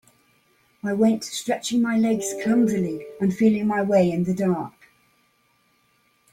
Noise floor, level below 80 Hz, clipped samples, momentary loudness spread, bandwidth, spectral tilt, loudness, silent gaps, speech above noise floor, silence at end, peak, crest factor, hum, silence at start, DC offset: -65 dBFS; -62 dBFS; under 0.1%; 9 LU; 15.5 kHz; -6 dB/octave; -22 LUFS; none; 43 dB; 1.65 s; -6 dBFS; 16 dB; 60 Hz at -40 dBFS; 0.85 s; under 0.1%